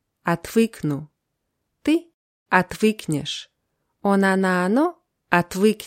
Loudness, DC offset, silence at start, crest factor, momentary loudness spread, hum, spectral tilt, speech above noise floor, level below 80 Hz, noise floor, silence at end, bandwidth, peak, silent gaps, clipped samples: -22 LUFS; under 0.1%; 0.25 s; 22 dB; 9 LU; none; -5.5 dB/octave; 56 dB; -58 dBFS; -77 dBFS; 0 s; 16.5 kHz; 0 dBFS; 2.14-2.46 s; under 0.1%